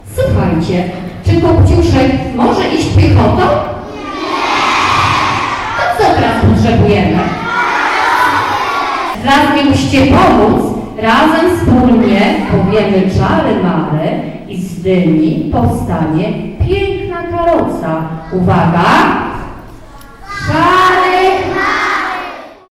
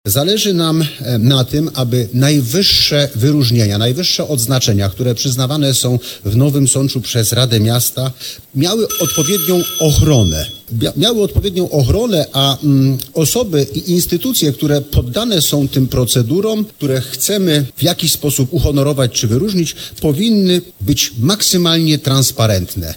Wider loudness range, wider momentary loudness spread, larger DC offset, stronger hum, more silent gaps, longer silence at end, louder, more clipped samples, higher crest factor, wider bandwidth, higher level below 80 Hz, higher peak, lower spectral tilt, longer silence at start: about the same, 4 LU vs 2 LU; first, 10 LU vs 6 LU; neither; neither; neither; first, 0.2 s vs 0 s; about the same, -11 LUFS vs -13 LUFS; neither; about the same, 10 dB vs 14 dB; second, 14.5 kHz vs 18 kHz; first, -26 dBFS vs -32 dBFS; about the same, -2 dBFS vs 0 dBFS; first, -6.5 dB/octave vs -4.5 dB/octave; about the same, 0.05 s vs 0.05 s